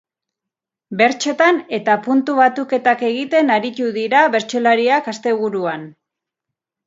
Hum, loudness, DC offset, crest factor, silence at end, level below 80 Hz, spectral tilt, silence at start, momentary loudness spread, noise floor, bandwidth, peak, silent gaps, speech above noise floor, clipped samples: none; -16 LUFS; under 0.1%; 18 dB; 0.95 s; -72 dBFS; -4 dB/octave; 0.9 s; 7 LU; -85 dBFS; 7.8 kHz; 0 dBFS; none; 68 dB; under 0.1%